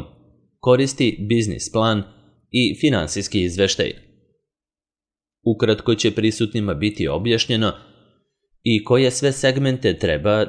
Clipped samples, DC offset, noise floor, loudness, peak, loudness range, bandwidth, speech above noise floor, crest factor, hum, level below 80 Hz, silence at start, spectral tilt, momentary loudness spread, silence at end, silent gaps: under 0.1%; under 0.1%; under -90 dBFS; -20 LUFS; -4 dBFS; 3 LU; 10.5 kHz; over 71 dB; 18 dB; none; -46 dBFS; 0 s; -5 dB/octave; 7 LU; 0 s; none